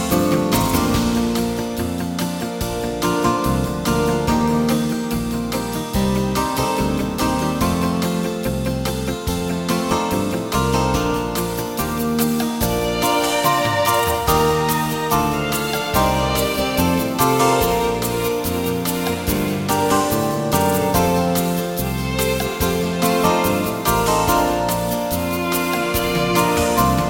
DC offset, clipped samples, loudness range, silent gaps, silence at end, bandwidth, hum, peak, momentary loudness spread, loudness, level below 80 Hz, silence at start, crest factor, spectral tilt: under 0.1%; under 0.1%; 3 LU; none; 0 s; 17 kHz; none; -2 dBFS; 6 LU; -19 LUFS; -34 dBFS; 0 s; 16 dB; -4.5 dB/octave